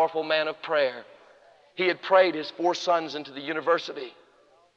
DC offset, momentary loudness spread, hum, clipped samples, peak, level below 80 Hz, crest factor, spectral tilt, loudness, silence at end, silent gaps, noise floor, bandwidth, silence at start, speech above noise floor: under 0.1%; 17 LU; none; under 0.1%; -6 dBFS; -84 dBFS; 20 dB; -4 dB/octave; -26 LUFS; 0.65 s; none; -60 dBFS; 7.4 kHz; 0 s; 34 dB